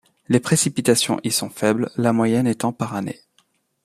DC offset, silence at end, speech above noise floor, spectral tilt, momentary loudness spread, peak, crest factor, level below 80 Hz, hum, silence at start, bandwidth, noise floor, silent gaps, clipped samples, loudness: under 0.1%; 0.7 s; 44 dB; -4.5 dB/octave; 9 LU; -2 dBFS; 18 dB; -60 dBFS; none; 0.3 s; 15.5 kHz; -64 dBFS; none; under 0.1%; -20 LUFS